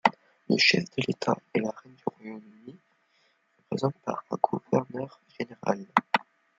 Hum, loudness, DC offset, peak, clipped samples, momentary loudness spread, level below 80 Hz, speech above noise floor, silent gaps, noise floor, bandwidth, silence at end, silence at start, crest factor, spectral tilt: none; -28 LUFS; under 0.1%; -2 dBFS; under 0.1%; 17 LU; -72 dBFS; 40 dB; none; -69 dBFS; 9.2 kHz; 0.35 s; 0.05 s; 28 dB; -5 dB/octave